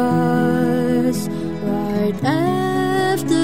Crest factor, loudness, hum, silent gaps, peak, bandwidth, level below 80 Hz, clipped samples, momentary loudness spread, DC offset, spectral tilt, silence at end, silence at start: 12 dB; -19 LUFS; none; none; -6 dBFS; 16 kHz; -48 dBFS; under 0.1%; 6 LU; 1%; -6.5 dB/octave; 0 s; 0 s